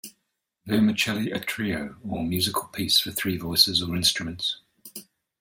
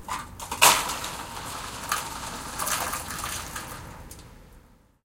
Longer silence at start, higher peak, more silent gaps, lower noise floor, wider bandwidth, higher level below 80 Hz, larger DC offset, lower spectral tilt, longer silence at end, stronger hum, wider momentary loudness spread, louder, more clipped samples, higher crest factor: about the same, 0.05 s vs 0 s; about the same, -2 dBFS vs -2 dBFS; neither; first, -78 dBFS vs -55 dBFS; about the same, 17 kHz vs 17 kHz; second, -56 dBFS vs -48 dBFS; neither; first, -3 dB/octave vs -0.5 dB/octave; about the same, 0.4 s vs 0.45 s; neither; second, 19 LU vs 23 LU; about the same, -24 LUFS vs -26 LUFS; neither; about the same, 24 dB vs 28 dB